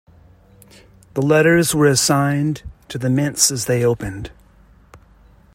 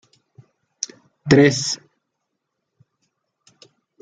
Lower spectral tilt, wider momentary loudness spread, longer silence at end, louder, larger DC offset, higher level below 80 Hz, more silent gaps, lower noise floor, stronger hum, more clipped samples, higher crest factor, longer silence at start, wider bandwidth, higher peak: about the same, -4.5 dB/octave vs -5 dB/octave; about the same, 16 LU vs 17 LU; second, 0.6 s vs 2.25 s; about the same, -17 LUFS vs -19 LUFS; neither; first, -46 dBFS vs -58 dBFS; neither; second, -49 dBFS vs -78 dBFS; neither; neither; about the same, 18 dB vs 22 dB; about the same, 1.15 s vs 1.25 s; first, 16.5 kHz vs 9.4 kHz; about the same, -2 dBFS vs -2 dBFS